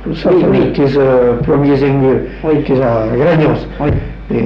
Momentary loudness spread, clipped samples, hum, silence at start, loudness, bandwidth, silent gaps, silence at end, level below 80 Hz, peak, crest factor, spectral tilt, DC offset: 6 LU; under 0.1%; none; 0 s; -12 LUFS; 6.2 kHz; none; 0 s; -28 dBFS; -2 dBFS; 10 dB; -10 dB/octave; under 0.1%